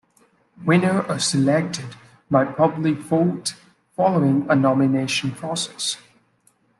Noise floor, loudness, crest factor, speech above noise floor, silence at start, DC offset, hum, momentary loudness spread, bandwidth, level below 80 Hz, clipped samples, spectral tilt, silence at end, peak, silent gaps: -62 dBFS; -21 LUFS; 18 dB; 42 dB; 0.6 s; under 0.1%; none; 11 LU; 12.5 kHz; -64 dBFS; under 0.1%; -5 dB/octave; 0.8 s; -4 dBFS; none